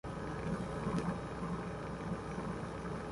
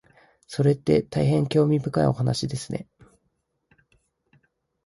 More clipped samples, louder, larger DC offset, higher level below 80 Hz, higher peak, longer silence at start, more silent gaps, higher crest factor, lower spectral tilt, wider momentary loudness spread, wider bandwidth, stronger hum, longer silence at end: neither; second, -40 LUFS vs -24 LUFS; neither; about the same, -52 dBFS vs -54 dBFS; second, -24 dBFS vs -6 dBFS; second, 0.05 s vs 0.5 s; neither; about the same, 16 dB vs 18 dB; about the same, -7 dB/octave vs -7 dB/octave; second, 5 LU vs 12 LU; about the same, 11.5 kHz vs 11.5 kHz; neither; second, 0 s vs 2 s